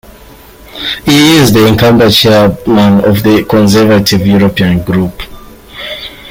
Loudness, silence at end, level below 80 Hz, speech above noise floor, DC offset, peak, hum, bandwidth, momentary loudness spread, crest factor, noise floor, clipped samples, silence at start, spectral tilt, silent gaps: -7 LUFS; 0 s; -32 dBFS; 28 dB; under 0.1%; 0 dBFS; none; 17 kHz; 15 LU; 8 dB; -34 dBFS; 0.1%; 0.75 s; -5.5 dB/octave; none